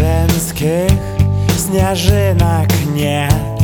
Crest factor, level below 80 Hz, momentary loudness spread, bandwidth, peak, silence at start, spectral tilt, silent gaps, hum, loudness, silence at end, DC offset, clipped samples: 12 dB; -24 dBFS; 3 LU; over 20 kHz; 0 dBFS; 0 s; -5.5 dB/octave; none; none; -14 LUFS; 0 s; under 0.1%; under 0.1%